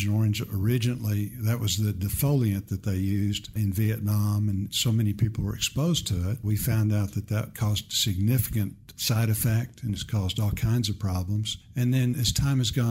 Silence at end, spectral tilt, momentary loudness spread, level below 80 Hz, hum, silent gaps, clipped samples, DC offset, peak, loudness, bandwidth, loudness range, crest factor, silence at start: 0 s; -5 dB/octave; 5 LU; -44 dBFS; none; none; under 0.1%; under 0.1%; -12 dBFS; -27 LUFS; 16 kHz; 1 LU; 14 dB; 0 s